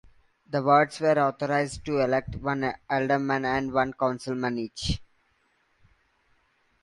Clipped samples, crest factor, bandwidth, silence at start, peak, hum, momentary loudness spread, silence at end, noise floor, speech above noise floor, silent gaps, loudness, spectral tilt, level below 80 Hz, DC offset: under 0.1%; 20 dB; 11.5 kHz; 0.5 s; -6 dBFS; none; 9 LU; 1.8 s; -69 dBFS; 43 dB; none; -26 LUFS; -5.5 dB/octave; -48 dBFS; under 0.1%